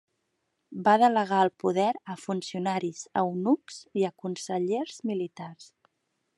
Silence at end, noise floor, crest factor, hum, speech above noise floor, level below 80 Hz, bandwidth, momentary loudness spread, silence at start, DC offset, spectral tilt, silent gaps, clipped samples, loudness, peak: 0.7 s; -78 dBFS; 20 dB; none; 51 dB; -84 dBFS; 11.5 kHz; 14 LU; 0.7 s; under 0.1%; -5.5 dB/octave; none; under 0.1%; -28 LUFS; -8 dBFS